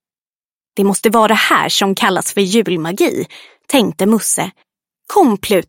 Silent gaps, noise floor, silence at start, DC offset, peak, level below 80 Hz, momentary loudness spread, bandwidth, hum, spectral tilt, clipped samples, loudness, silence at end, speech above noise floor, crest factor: none; under -90 dBFS; 0.75 s; under 0.1%; 0 dBFS; -56 dBFS; 7 LU; 17 kHz; none; -3.5 dB/octave; under 0.1%; -14 LUFS; 0.05 s; over 76 dB; 14 dB